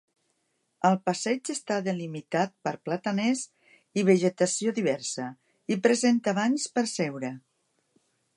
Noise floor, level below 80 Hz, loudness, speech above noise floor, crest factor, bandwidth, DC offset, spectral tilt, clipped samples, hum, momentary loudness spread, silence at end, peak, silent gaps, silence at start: -75 dBFS; -80 dBFS; -27 LUFS; 49 dB; 20 dB; 11.5 kHz; under 0.1%; -4.5 dB/octave; under 0.1%; none; 12 LU; 1 s; -8 dBFS; none; 0.85 s